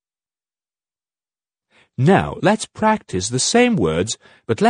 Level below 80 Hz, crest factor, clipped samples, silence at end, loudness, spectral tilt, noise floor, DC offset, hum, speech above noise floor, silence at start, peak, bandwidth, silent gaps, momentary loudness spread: -48 dBFS; 18 dB; under 0.1%; 0 s; -18 LUFS; -4.5 dB/octave; under -90 dBFS; under 0.1%; none; over 72 dB; 2 s; 0 dBFS; 10 kHz; none; 10 LU